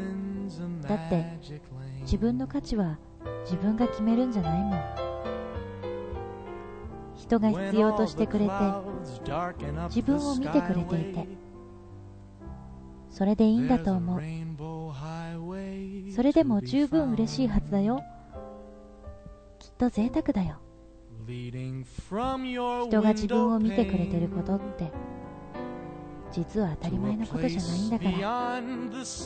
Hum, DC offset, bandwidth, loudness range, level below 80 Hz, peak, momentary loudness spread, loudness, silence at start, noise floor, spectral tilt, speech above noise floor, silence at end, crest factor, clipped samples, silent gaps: none; under 0.1%; 9 kHz; 5 LU; -46 dBFS; -10 dBFS; 20 LU; -29 LUFS; 0 s; -50 dBFS; -7 dB/octave; 23 dB; 0 s; 18 dB; under 0.1%; none